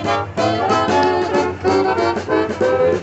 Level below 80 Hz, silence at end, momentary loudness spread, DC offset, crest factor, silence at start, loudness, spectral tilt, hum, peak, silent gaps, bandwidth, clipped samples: -54 dBFS; 0 s; 3 LU; under 0.1%; 14 dB; 0 s; -17 LUFS; -5.5 dB/octave; none; -4 dBFS; none; 8.2 kHz; under 0.1%